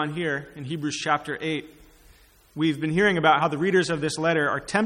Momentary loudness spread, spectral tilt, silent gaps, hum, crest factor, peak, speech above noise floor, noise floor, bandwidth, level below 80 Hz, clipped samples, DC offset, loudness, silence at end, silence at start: 11 LU; -5 dB/octave; none; none; 20 dB; -4 dBFS; 31 dB; -55 dBFS; 14 kHz; -58 dBFS; under 0.1%; under 0.1%; -24 LUFS; 0 s; 0 s